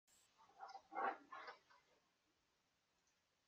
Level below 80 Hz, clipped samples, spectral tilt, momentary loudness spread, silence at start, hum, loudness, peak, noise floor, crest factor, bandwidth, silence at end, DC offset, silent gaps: under -90 dBFS; under 0.1%; -2.5 dB/octave; 15 LU; 0.4 s; none; -51 LUFS; -32 dBFS; -85 dBFS; 24 dB; 12 kHz; 1.7 s; under 0.1%; none